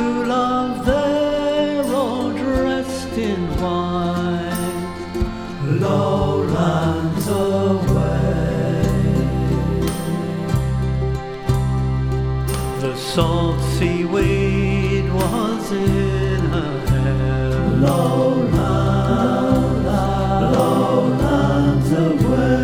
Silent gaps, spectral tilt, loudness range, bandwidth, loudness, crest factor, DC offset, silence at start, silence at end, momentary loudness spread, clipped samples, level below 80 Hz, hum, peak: none; -7 dB/octave; 4 LU; 15.5 kHz; -19 LUFS; 14 dB; under 0.1%; 0 s; 0 s; 6 LU; under 0.1%; -28 dBFS; none; -2 dBFS